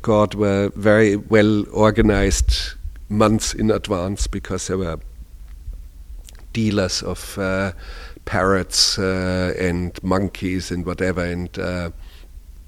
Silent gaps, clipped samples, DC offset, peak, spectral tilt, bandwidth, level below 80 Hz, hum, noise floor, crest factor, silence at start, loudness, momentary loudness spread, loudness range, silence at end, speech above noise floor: none; under 0.1%; under 0.1%; 0 dBFS; -5 dB/octave; 15.5 kHz; -30 dBFS; none; -39 dBFS; 20 dB; 0 s; -20 LUFS; 14 LU; 8 LU; 0.05 s; 20 dB